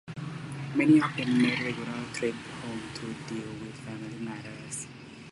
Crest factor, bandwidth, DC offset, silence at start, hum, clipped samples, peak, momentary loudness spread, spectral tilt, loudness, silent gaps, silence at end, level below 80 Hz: 20 dB; 11.5 kHz; under 0.1%; 0.05 s; none; under 0.1%; -10 dBFS; 17 LU; -5.5 dB/octave; -30 LUFS; none; 0 s; -64 dBFS